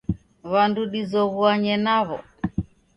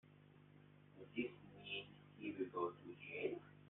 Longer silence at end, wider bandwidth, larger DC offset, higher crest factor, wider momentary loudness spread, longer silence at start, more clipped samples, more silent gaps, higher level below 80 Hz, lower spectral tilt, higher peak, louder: first, 0.3 s vs 0 s; first, 6 kHz vs 4 kHz; neither; about the same, 18 dB vs 20 dB; second, 11 LU vs 21 LU; about the same, 0.1 s vs 0.05 s; neither; neither; first, -46 dBFS vs -84 dBFS; first, -7.5 dB/octave vs -3.5 dB/octave; first, -4 dBFS vs -28 dBFS; first, -23 LUFS vs -48 LUFS